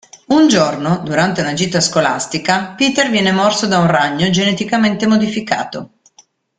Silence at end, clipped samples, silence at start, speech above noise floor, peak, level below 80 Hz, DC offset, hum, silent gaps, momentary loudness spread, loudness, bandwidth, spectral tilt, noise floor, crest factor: 0.7 s; under 0.1%; 0.3 s; 37 dB; 0 dBFS; -52 dBFS; under 0.1%; none; none; 6 LU; -14 LUFS; 9.6 kHz; -4.5 dB/octave; -51 dBFS; 14 dB